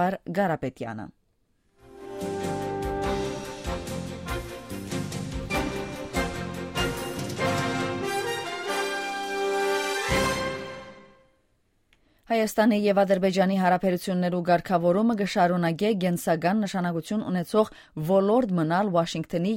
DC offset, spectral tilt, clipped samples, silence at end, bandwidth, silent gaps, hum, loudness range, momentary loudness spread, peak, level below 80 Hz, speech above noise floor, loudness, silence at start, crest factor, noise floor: under 0.1%; -5.5 dB/octave; under 0.1%; 0 s; 16 kHz; none; none; 9 LU; 12 LU; -8 dBFS; -46 dBFS; 45 dB; -26 LUFS; 0 s; 18 dB; -69 dBFS